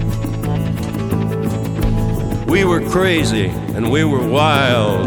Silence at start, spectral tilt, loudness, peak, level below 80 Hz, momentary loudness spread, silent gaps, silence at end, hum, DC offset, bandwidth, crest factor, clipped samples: 0 s; -6 dB/octave; -17 LUFS; 0 dBFS; -28 dBFS; 7 LU; none; 0 s; none; under 0.1%; 19 kHz; 16 dB; under 0.1%